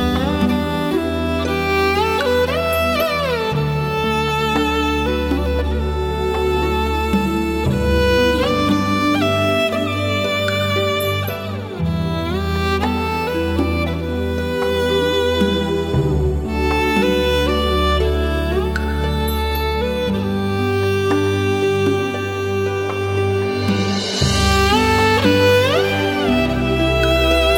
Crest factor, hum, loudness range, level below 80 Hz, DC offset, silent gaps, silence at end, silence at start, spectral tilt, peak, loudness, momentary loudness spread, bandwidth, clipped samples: 14 dB; none; 4 LU; -26 dBFS; under 0.1%; none; 0 s; 0 s; -5.5 dB/octave; -2 dBFS; -18 LUFS; 6 LU; 17.5 kHz; under 0.1%